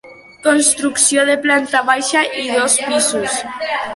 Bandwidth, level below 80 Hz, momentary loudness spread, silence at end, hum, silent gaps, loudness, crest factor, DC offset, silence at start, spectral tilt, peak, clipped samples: 12 kHz; -60 dBFS; 8 LU; 0 s; none; none; -14 LUFS; 16 dB; under 0.1%; 0.05 s; -0.5 dB/octave; 0 dBFS; under 0.1%